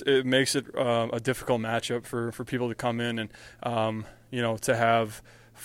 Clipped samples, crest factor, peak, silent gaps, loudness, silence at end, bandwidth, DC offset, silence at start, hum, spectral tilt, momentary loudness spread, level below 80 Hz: under 0.1%; 20 dB; -8 dBFS; none; -28 LUFS; 0 s; 16.5 kHz; under 0.1%; 0 s; none; -4.5 dB/octave; 11 LU; -60 dBFS